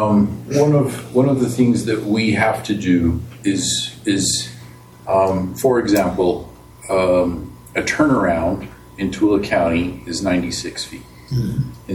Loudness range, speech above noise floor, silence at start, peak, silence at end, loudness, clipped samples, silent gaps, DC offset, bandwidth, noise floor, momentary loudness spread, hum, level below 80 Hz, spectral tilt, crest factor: 2 LU; 22 dB; 0 s; -2 dBFS; 0 s; -18 LUFS; under 0.1%; none; under 0.1%; 17.5 kHz; -40 dBFS; 11 LU; none; -42 dBFS; -5 dB/octave; 16 dB